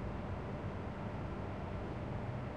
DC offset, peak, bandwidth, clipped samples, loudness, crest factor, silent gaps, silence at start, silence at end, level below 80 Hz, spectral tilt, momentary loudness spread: 0.1%; -30 dBFS; 9.4 kHz; under 0.1%; -43 LUFS; 12 dB; none; 0 s; 0 s; -50 dBFS; -8.5 dB/octave; 1 LU